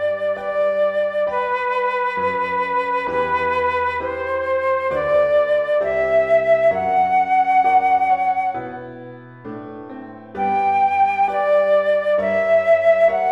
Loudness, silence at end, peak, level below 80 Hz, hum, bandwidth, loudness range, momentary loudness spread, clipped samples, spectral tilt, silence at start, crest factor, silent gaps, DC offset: -18 LUFS; 0 s; -6 dBFS; -52 dBFS; none; 8 kHz; 4 LU; 18 LU; under 0.1%; -6 dB/octave; 0 s; 12 dB; none; under 0.1%